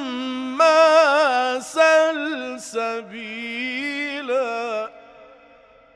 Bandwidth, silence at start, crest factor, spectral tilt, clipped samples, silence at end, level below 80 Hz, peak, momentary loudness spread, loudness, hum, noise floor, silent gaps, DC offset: 11 kHz; 0 s; 16 dB; -2 dB/octave; under 0.1%; 0.7 s; -68 dBFS; -6 dBFS; 15 LU; -20 LUFS; none; -51 dBFS; none; under 0.1%